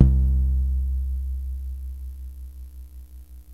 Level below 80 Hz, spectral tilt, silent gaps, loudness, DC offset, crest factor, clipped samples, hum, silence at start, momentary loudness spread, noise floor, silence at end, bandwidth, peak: -24 dBFS; -10 dB/octave; none; -26 LUFS; 0.2%; 22 dB; under 0.1%; 60 Hz at -45 dBFS; 0 s; 21 LU; -43 dBFS; 0 s; 1 kHz; -2 dBFS